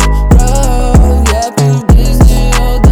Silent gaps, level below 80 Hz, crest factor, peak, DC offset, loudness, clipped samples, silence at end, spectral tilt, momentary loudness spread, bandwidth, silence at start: none; -8 dBFS; 6 dB; 0 dBFS; under 0.1%; -9 LUFS; 4%; 0 s; -6 dB/octave; 3 LU; 16 kHz; 0 s